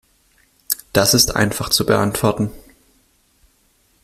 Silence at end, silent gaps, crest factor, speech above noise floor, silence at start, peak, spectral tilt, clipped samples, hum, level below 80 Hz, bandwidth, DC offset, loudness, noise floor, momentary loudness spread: 1.45 s; none; 20 dB; 43 dB; 0.7 s; 0 dBFS; -3.5 dB/octave; under 0.1%; none; -42 dBFS; 16 kHz; under 0.1%; -17 LUFS; -59 dBFS; 11 LU